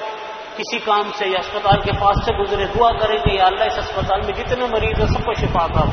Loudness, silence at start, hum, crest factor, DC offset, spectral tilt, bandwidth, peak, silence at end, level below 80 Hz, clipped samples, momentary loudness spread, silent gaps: -18 LUFS; 0 s; none; 18 dB; under 0.1%; -6 dB/octave; 6.6 kHz; -2 dBFS; 0 s; -30 dBFS; under 0.1%; 7 LU; none